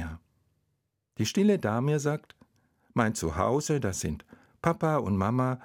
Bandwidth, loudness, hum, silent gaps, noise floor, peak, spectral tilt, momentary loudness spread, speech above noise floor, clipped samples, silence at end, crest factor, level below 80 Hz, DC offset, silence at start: 16.5 kHz; -28 LUFS; none; none; -78 dBFS; -8 dBFS; -6 dB/octave; 12 LU; 51 dB; under 0.1%; 0 s; 20 dB; -54 dBFS; under 0.1%; 0 s